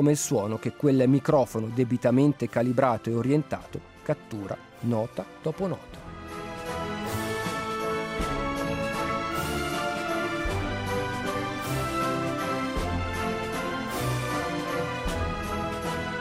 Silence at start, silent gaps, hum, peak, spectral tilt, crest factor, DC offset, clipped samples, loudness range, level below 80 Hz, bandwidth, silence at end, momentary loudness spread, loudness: 0 s; none; none; -8 dBFS; -5.5 dB/octave; 20 dB; under 0.1%; under 0.1%; 8 LU; -44 dBFS; 16 kHz; 0 s; 11 LU; -28 LUFS